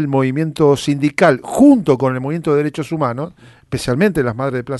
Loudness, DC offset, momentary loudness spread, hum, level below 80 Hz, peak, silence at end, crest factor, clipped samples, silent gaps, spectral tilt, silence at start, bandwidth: -15 LUFS; under 0.1%; 10 LU; none; -46 dBFS; 0 dBFS; 0 s; 14 dB; under 0.1%; none; -7 dB/octave; 0 s; 12 kHz